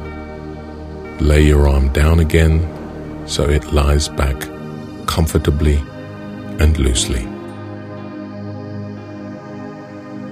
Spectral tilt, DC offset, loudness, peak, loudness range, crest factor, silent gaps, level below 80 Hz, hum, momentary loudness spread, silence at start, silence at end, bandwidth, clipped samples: -5.5 dB/octave; under 0.1%; -16 LUFS; 0 dBFS; 6 LU; 18 dB; none; -20 dBFS; none; 17 LU; 0 s; 0 s; 15.5 kHz; under 0.1%